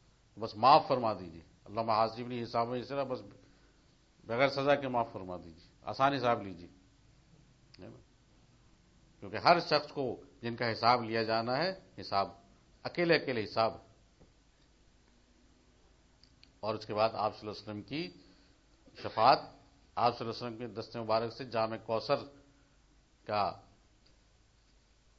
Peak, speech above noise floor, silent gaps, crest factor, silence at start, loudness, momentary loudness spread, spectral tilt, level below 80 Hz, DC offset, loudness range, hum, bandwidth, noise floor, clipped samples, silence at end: -8 dBFS; 34 dB; none; 26 dB; 0.35 s; -33 LUFS; 18 LU; -3 dB/octave; -66 dBFS; under 0.1%; 8 LU; none; 7.6 kHz; -66 dBFS; under 0.1%; 1.6 s